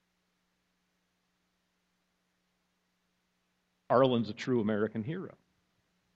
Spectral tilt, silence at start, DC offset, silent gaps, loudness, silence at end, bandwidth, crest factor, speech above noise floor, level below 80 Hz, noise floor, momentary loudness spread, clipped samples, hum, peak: -7.5 dB/octave; 3.9 s; under 0.1%; none; -31 LUFS; 0.9 s; 7.8 kHz; 24 dB; 48 dB; -74 dBFS; -78 dBFS; 14 LU; under 0.1%; none; -12 dBFS